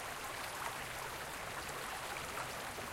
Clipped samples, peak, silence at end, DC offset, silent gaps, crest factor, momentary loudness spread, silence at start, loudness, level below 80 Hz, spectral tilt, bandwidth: under 0.1%; -24 dBFS; 0 s; under 0.1%; none; 20 dB; 2 LU; 0 s; -42 LUFS; -62 dBFS; -2 dB/octave; 16 kHz